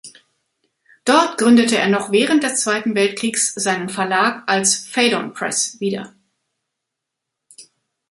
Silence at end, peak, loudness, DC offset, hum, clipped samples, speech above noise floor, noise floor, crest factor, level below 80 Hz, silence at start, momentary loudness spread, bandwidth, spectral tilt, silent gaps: 0.5 s; -2 dBFS; -17 LUFS; under 0.1%; none; under 0.1%; 63 dB; -81 dBFS; 18 dB; -66 dBFS; 0.05 s; 8 LU; 11.5 kHz; -2.5 dB/octave; none